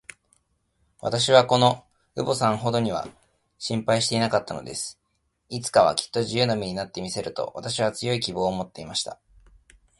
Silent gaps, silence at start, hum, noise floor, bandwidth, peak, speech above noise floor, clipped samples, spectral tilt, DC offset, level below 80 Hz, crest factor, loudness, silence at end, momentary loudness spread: none; 1.05 s; none; -73 dBFS; 11.5 kHz; -2 dBFS; 49 dB; under 0.1%; -4 dB/octave; under 0.1%; -58 dBFS; 24 dB; -24 LUFS; 0.85 s; 13 LU